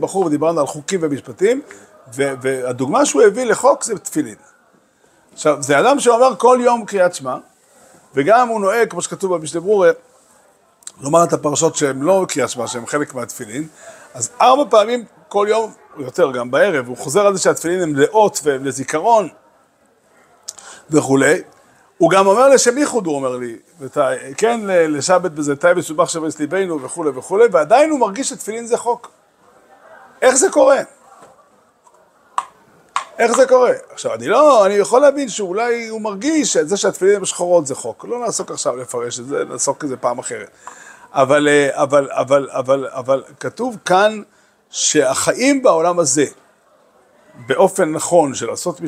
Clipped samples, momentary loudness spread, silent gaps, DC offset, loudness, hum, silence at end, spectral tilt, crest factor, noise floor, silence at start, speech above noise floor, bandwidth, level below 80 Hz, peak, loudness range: under 0.1%; 14 LU; none; under 0.1%; -16 LUFS; none; 0 s; -3.5 dB/octave; 16 dB; -56 dBFS; 0 s; 40 dB; 15.5 kHz; -66 dBFS; 0 dBFS; 4 LU